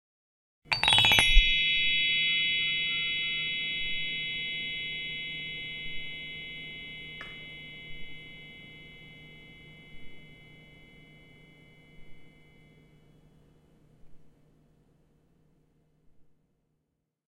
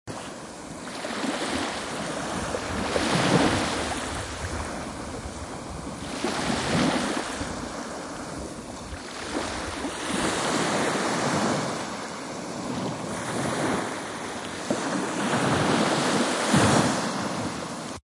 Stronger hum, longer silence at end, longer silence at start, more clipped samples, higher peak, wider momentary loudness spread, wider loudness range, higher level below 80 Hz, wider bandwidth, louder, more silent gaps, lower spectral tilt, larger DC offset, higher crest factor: neither; first, 1.15 s vs 0.05 s; first, 0.65 s vs 0.05 s; neither; first, 0 dBFS vs -8 dBFS; first, 26 LU vs 13 LU; first, 25 LU vs 6 LU; first, -40 dBFS vs -48 dBFS; first, 15 kHz vs 11.5 kHz; about the same, -26 LUFS vs -27 LUFS; neither; second, -1.5 dB/octave vs -4 dB/octave; neither; first, 32 dB vs 20 dB